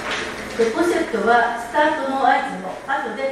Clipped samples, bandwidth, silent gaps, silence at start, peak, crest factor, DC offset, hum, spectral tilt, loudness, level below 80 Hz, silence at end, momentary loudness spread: under 0.1%; 14.5 kHz; none; 0 s; -4 dBFS; 16 dB; under 0.1%; none; -4 dB/octave; -20 LUFS; -52 dBFS; 0 s; 8 LU